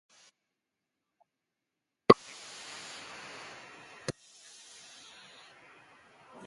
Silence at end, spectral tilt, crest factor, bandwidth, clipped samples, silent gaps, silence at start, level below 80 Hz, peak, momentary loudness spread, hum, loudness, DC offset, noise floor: 2.35 s; -5 dB/octave; 36 dB; 11.5 kHz; under 0.1%; none; 2.1 s; -70 dBFS; 0 dBFS; 27 LU; none; -31 LUFS; under 0.1%; -87 dBFS